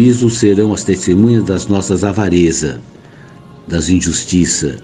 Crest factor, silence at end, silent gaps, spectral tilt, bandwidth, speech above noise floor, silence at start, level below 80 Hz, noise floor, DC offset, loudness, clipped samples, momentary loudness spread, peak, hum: 12 dB; 0.05 s; none; -5.5 dB/octave; 11.5 kHz; 25 dB; 0 s; -36 dBFS; -37 dBFS; under 0.1%; -13 LUFS; under 0.1%; 8 LU; 0 dBFS; none